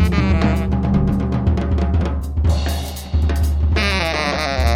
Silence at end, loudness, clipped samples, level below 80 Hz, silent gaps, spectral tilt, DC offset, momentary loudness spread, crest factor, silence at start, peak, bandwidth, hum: 0 s; -19 LUFS; under 0.1%; -20 dBFS; none; -6.5 dB/octave; under 0.1%; 4 LU; 14 dB; 0 s; -4 dBFS; 15 kHz; none